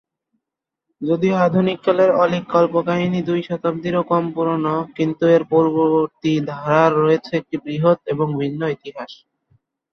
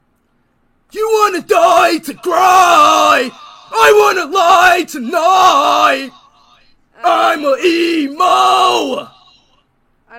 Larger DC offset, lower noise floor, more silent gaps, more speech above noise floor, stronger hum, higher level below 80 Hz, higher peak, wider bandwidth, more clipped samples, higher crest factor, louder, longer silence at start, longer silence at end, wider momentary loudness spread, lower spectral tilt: neither; first, -84 dBFS vs -59 dBFS; neither; first, 66 dB vs 49 dB; neither; second, -60 dBFS vs -54 dBFS; about the same, 0 dBFS vs 0 dBFS; second, 6.6 kHz vs 17 kHz; neither; first, 18 dB vs 12 dB; second, -18 LUFS vs -11 LUFS; about the same, 1 s vs 0.95 s; first, 0.8 s vs 0 s; about the same, 9 LU vs 11 LU; first, -8 dB/octave vs -1.5 dB/octave